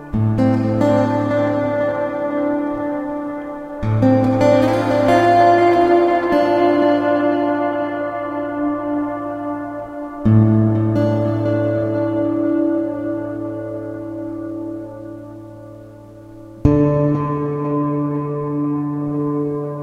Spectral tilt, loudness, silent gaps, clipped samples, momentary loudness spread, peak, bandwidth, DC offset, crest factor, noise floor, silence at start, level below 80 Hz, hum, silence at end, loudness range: -8.5 dB/octave; -18 LUFS; none; under 0.1%; 14 LU; 0 dBFS; 9.4 kHz; under 0.1%; 18 dB; -38 dBFS; 0 s; -42 dBFS; none; 0 s; 9 LU